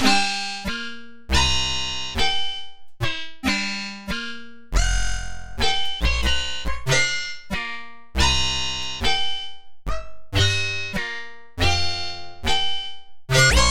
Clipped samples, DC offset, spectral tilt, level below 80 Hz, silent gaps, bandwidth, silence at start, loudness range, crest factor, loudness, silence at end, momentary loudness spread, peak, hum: under 0.1%; under 0.1%; -2.5 dB/octave; -30 dBFS; none; 17 kHz; 0 s; 3 LU; 20 dB; -23 LUFS; 0 s; 15 LU; -2 dBFS; none